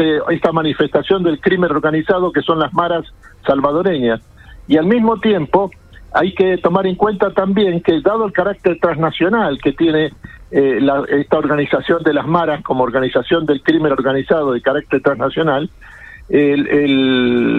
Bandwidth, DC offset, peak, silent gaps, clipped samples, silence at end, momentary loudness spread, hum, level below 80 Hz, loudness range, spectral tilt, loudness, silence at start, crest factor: 6 kHz; under 0.1%; 0 dBFS; none; under 0.1%; 0 s; 4 LU; none; -44 dBFS; 1 LU; -8.5 dB/octave; -15 LUFS; 0 s; 14 dB